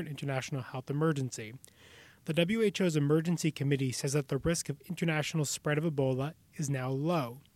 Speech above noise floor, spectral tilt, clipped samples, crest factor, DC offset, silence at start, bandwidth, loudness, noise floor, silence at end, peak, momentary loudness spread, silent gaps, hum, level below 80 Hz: 25 dB; -5.5 dB/octave; under 0.1%; 18 dB; under 0.1%; 0 s; 16 kHz; -32 LUFS; -57 dBFS; 0.15 s; -14 dBFS; 10 LU; none; none; -60 dBFS